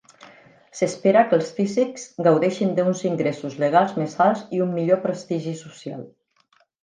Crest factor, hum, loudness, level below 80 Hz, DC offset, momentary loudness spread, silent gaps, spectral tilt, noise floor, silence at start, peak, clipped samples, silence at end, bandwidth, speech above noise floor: 18 dB; none; -21 LUFS; -72 dBFS; under 0.1%; 15 LU; none; -6.5 dB/octave; -63 dBFS; 0.75 s; -4 dBFS; under 0.1%; 0.75 s; 9.8 kHz; 42 dB